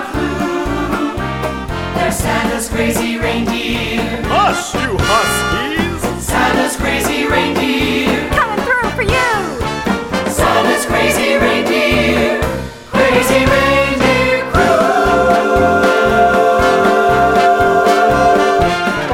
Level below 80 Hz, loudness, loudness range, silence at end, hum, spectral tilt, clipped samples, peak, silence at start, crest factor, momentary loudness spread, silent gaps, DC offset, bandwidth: -30 dBFS; -13 LUFS; 5 LU; 0 s; none; -4.5 dB/octave; under 0.1%; 0 dBFS; 0 s; 12 dB; 7 LU; none; under 0.1%; 17 kHz